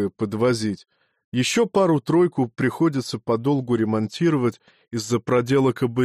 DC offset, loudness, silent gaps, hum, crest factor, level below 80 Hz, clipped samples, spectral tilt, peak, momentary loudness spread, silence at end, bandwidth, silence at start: under 0.1%; -22 LUFS; 1.24-1.32 s; none; 12 dB; -60 dBFS; under 0.1%; -6 dB/octave; -8 dBFS; 8 LU; 0 s; 14 kHz; 0 s